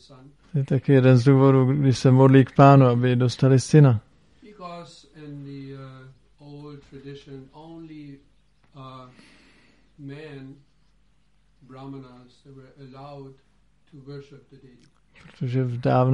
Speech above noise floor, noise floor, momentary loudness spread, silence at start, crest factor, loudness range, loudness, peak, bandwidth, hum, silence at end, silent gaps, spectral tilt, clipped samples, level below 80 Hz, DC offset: 43 dB; -64 dBFS; 27 LU; 0.55 s; 20 dB; 27 LU; -18 LUFS; -2 dBFS; 10.5 kHz; none; 0 s; none; -8 dB/octave; under 0.1%; -58 dBFS; under 0.1%